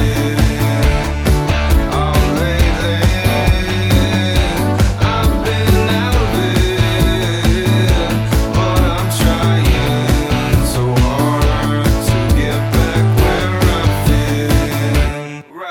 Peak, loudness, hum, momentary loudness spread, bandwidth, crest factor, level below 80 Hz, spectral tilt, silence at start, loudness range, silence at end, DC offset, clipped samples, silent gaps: -2 dBFS; -14 LUFS; none; 2 LU; 18.5 kHz; 12 dB; -18 dBFS; -5.5 dB/octave; 0 s; 0 LU; 0 s; under 0.1%; under 0.1%; none